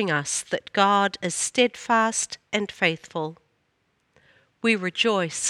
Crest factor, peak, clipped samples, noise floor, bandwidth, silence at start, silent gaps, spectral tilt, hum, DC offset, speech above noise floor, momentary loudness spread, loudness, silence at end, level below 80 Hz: 20 dB; -6 dBFS; under 0.1%; -70 dBFS; 14.5 kHz; 0 s; none; -2.5 dB/octave; none; under 0.1%; 46 dB; 8 LU; -23 LUFS; 0 s; -70 dBFS